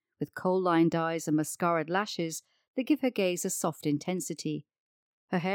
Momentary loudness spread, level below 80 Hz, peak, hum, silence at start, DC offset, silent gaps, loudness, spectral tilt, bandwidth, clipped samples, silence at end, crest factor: 11 LU; -80 dBFS; -14 dBFS; none; 0.2 s; under 0.1%; 2.68-2.74 s, 4.80-5.28 s; -30 LUFS; -5 dB/octave; 19 kHz; under 0.1%; 0 s; 16 dB